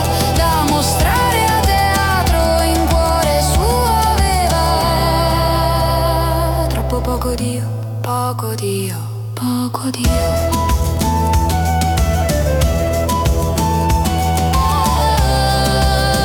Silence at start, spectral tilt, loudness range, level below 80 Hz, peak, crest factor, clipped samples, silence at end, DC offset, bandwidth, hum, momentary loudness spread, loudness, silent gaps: 0 s; -5 dB/octave; 5 LU; -22 dBFS; -4 dBFS; 10 dB; under 0.1%; 0 s; under 0.1%; 18 kHz; none; 6 LU; -15 LUFS; none